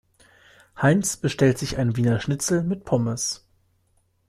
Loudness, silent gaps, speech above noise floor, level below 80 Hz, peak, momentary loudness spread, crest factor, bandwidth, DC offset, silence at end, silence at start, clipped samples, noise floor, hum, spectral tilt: -23 LUFS; none; 44 dB; -50 dBFS; -6 dBFS; 5 LU; 18 dB; 14 kHz; under 0.1%; 0.9 s; 0.75 s; under 0.1%; -66 dBFS; none; -5 dB/octave